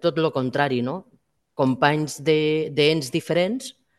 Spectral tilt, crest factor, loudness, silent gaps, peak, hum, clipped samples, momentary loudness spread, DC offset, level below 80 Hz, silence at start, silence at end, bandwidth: -5.5 dB/octave; 20 dB; -22 LUFS; none; -2 dBFS; none; under 0.1%; 9 LU; under 0.1%; -64 dBFS; 0.05 s; 0.25 s; 12.5 kHz